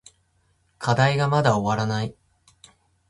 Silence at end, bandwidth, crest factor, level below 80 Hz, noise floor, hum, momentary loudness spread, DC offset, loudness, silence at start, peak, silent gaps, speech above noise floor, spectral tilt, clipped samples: 0.95 s; 11.5 kHz; 20 dB; -54 dBFS; -66 dBFS; none; 10 LU; under 0.1%; -22 LUFS; 0.8 s; -4 dBFS; none; 45 dB; -6 dB/octave; under 0.1%